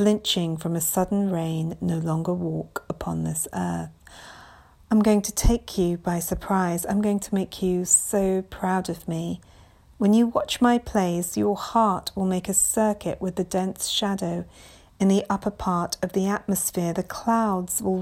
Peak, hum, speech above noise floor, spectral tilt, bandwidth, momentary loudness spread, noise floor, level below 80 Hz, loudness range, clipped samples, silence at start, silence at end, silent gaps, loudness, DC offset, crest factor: -6 dBFS; none; 26 dB; -4.5 dB/octave; 16.5 kHz; 10 LU; -50 dBFS; -40 dBFS; 4 LU; under 0.1%; 0 s; 0 s; none; -24 LUFS; under 0.1%; 18 dB